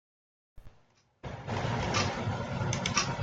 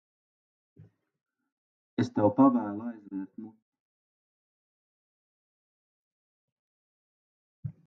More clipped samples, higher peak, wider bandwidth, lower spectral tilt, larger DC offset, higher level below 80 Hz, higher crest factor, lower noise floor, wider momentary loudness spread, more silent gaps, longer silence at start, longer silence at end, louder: neither; second, -12 dBFS vs -8 dBFS; first, 9.2 kHz vs 6.8 kHz; second, -4 dB/octave vs -8 dB/octave; neither; first, -52 dBFS vs -70 dBFS; about the same, 22 dB vs 26 dB; second, -65 dBFS vs under -90 dBFS; second, 14 LU vs 21 LU; second, none vs 1.52-1.97 s, 3.62-3.72 s, 3.80-7.63 s; second, 0.55 s vs 0.8 s; second, 0 s vs 0.15 s; second, -32 LUFS vs -28 LUFS